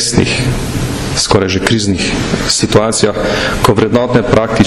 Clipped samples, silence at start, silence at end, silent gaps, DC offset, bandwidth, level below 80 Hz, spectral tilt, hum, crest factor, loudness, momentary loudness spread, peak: under 0.1%; 0 s; 0 s; none; under 0.1%; 15 kHz; -28 dBFS; -4.5 dB/octave; none; 12 dB; -12 LUFS; 5 LU; 0 dBFS